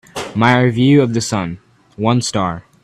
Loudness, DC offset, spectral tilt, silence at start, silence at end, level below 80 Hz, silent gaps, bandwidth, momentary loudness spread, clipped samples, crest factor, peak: -15 LUFS; under 0.1%; -5.5 dB/octave; 0.15 s; 0.25 s; -48 dBFS; none; 13 kHz; 12 LU; under 0.1%; 16 dB; 0 dBFS